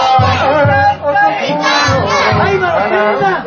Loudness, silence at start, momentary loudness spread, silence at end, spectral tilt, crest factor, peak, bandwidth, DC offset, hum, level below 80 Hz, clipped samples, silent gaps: -11 LUFS; 0 s; 2 LU; 0 s; -5 dB/octave; 10 dB; 0 dBFS; 7.4 kHz; under 0.1%; none; -32 dBFS; under 0.1%; none